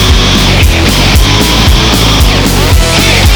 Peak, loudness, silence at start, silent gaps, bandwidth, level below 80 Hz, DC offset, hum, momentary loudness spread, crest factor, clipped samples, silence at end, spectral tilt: 0 dBFS; -6 LUFS; 0 s; none; over 20 kHz; -10 dBFS; under 0.1%; none; 1 LU; 6 dB; 3%; 0 s; -4 dB/octave